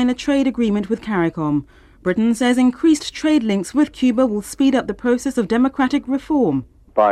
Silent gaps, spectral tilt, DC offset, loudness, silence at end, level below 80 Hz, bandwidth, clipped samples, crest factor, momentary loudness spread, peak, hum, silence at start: none; -5.5 dB/octave; under 0.1%; -18 LUFS; 0 s; -48 dBFS; 13 kHz; under 0.1%; 14 dB; 6 LU; -4 dBFS; none; 0 s